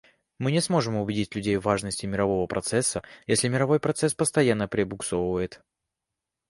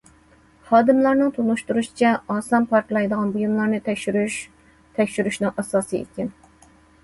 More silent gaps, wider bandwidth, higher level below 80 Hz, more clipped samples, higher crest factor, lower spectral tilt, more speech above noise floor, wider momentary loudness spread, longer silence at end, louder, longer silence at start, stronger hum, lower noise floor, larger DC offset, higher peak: neither; about the same, 11.5 kHz vs 12 kHz; first, -52 dBFS vs -58 dBFS; neither; about the same, 20 dB vs 18 dB; about the same, -4.5 dB/octave vs -5.5 dB/octave; first, 61 dB vs 33 dB; second, 5 LU vs 12 LU; first, 0.95 s vs 0.75 s; second, -26 LUFS vs -21 LUFS; second, 0.4 s vs 0.65 s; neither; first, -86 dBFS vs -54 dBFS; neither; second, -8 dBFS vs -4 dBFS